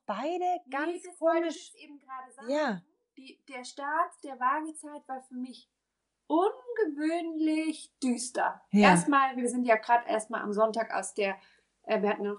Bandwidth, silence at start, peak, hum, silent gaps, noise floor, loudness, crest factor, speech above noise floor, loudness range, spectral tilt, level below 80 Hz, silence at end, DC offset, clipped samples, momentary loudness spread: 11.5 kHz; 0.1 s; -10 dBFS; none; none; -84 dBFS; -29 LUFS; 20 dB; 54 dB; 8 LU; -5 dB/octave; -74 dBFS; 0 s; under 0.1%; under 0.1%; 17 LU